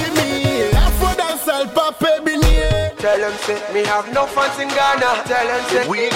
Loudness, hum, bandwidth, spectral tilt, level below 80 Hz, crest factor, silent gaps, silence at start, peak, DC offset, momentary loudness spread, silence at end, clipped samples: -17 LUFS; none; 16.5 kHz; -4.5 dB/octave; -24 dBFS; 12 dB; none; 0 s; -4 dBFS; under 0.1%; 3 LU; 0 s; under 0.1%